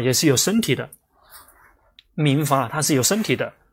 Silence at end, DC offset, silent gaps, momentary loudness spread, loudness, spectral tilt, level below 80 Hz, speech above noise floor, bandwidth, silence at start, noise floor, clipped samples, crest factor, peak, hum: 0.2 s; under 0.1%; none; 8 LU; -20 LUFS; -4 dB/octave; -58 dBFS; 35 dB; 16.5 kHz; 0 s; -55 dBFS; under 0.1%; 18 dB; -4 dBFS; none